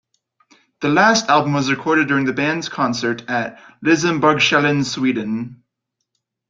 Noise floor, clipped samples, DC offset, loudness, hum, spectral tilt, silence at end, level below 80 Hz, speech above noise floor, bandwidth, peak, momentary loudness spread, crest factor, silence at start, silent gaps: -77 dBFS; under 0.1%; under 0.1%; -17 LUFS; none; -4.5 dB/octave; 0.95 s; -60 dBFS; 60 dB; 7.8 kHz; -2 dBFS; 10 LU; 18 dB; 0.8 s; none